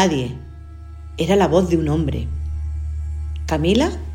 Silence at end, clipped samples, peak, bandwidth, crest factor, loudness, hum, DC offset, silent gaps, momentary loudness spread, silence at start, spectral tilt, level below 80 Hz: 0 s; under 0.1%; -2 dBFS; 16 kHz; 18 dB; -20 LUFS; none; under 0.1%; none; 20 LU; 0 s; -6.5 dB/octave; -28 dBFS